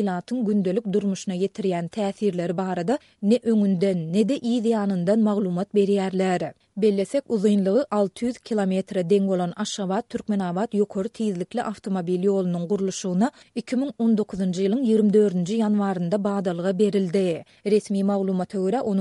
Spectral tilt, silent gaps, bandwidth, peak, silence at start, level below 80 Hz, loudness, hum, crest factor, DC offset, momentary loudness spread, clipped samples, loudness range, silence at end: -7 dB/octave; none; 11.5 kHz; -8 dBFS; 0 s; -66 dBFS; -24 LUFS; none; 14 dB; under 0.1%; 6 LU; under 0.1%; 3 LU; 0 s